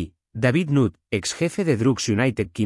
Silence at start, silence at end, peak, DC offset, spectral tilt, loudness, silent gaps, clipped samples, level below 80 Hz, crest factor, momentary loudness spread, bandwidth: 0 s; 0 s; -8 dBFS; under 0.1%; -5.5 dB/octave; -22 LUFS; none; under 0.1%; -52 dBFS; 14 dB; 6 LU; 12 kHz